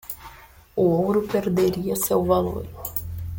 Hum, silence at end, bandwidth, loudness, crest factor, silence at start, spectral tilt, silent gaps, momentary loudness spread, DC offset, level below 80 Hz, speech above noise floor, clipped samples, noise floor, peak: none; 0 s; 17 kHz; -23 LUFS; 16 dB; 0.05 s; -6 dB/octave; none; 12 LU; under 0.1%; -46 dBFS; 24 dB; under 0.1%; -46 dBFS; -8 dBFS